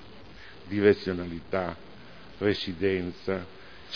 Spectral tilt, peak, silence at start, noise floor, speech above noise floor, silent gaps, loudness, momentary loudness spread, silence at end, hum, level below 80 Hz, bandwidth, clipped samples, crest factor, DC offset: -7.5 dB/octave; -8 dBFS; 0 s; -49 dBFS; 21 dB; none; -29 LUFS; 25 LU; 0 s; none; -56 dBFS; 5.4 kHz; under 0.1%; 22 dB; 0.4%